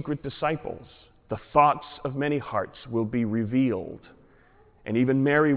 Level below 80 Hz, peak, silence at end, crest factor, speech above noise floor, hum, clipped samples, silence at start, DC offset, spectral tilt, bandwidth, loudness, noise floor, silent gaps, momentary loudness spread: -56 dBFS; -8 dBFS; 0 s; 20 dB; 31 dB; none; under 0.1%; 0 s; under 0.1%; -11 dB/octave; 4 kHz; -26 LUFS; -57 dBFS; none; 17 LU